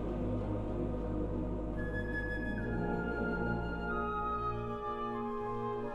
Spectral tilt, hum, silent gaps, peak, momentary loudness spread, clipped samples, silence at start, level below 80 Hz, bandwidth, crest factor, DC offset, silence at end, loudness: -9 dB/octave; none; none; -24 dBFS; 3 LU; under 0.1%; 0 s; -44 dBFS; 7.2 kHz; 12 dB; under 0.1%; 0 s; -37 LUFS